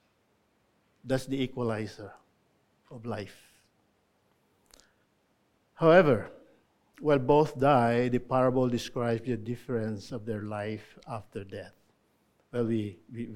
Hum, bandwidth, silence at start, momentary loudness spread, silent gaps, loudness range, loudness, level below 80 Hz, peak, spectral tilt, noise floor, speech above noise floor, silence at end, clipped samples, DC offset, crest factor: none; 15.5 kHz; 1.05 s; 18 LU; none; 19 LU; -28 LUFS; -58 dBFS; -6 dBFS; -7 dB/octave; -71 dBFS; 43 dB; 0 s; under 0.1%; under 0.1%; 24 dB